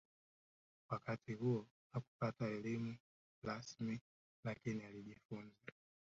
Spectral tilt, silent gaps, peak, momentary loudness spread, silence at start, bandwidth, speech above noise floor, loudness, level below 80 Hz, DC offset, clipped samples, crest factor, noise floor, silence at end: -7 dB/octave; 1.70-1.90 s, 2.07-2.19 s, 3.00-3.42 s, 4.01-4.43 s, 5.25-5.29 s; -28 dBFS; 13 LU; 0.9 s; 7.6 kHz; over 45 dB; -46 LUFS; -78 dBFS; under 0.1%; under 0.1%; 20 dB; under -90 dBFS; 0.4 s